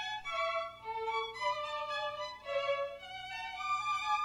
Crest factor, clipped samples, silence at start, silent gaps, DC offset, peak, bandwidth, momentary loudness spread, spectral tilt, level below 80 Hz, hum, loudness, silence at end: 16 dB; under 0.1%; 0 s; none; under 0.1%; -22 dBFS; 15 kHz; 7 LU; -1 dB/octave; -68 dBFS; 60 Hz at -65 dBFS; -37 LUFS; 0 s